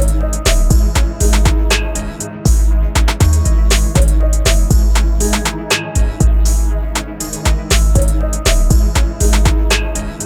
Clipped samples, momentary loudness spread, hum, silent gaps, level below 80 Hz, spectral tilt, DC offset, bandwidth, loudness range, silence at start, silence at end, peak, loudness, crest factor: under 0.1%; 5 LU; none; none; -12 dBFS; -4.5 dB/octave; under 0.1%; 16 kHz; 2 LU; 0 s; 0 s; 0 dBFS; -14 LUFS; 10 dB